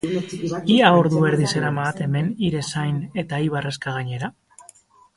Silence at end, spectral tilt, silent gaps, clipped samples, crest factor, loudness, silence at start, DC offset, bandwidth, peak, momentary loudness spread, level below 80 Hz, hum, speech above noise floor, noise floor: 0.85 s; -6 dB/octave; none; under 0.1%; 20 dB; -21 LUFS; 0.05 s; under 0.1%; 11.5 kHz; 0 dBFS; 12 LU; -56 dBFS; none; 31 dB; -51 dBFS